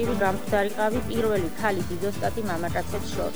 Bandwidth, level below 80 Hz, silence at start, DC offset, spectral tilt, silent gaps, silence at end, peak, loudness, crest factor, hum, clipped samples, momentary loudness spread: over 20 kHz; -42 dBFS; 0 s; 2%; -5.5 dB/octave; none; 0 s; -10 dBFS; -27 LUFS; 18 dB; none; under 0.1%; 5 LU